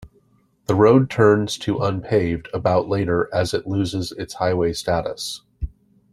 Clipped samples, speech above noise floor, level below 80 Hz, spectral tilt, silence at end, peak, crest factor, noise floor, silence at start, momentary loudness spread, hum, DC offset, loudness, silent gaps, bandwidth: under 0.1%; 41 dB; -42 dBFS; -6 dB/octave; 0.45 s; -2 dBFS; 18 dB; -60 dBFS; 0 s; 15 LU; none; under 0.1%; -20 LUFS; none; 13.5 kHz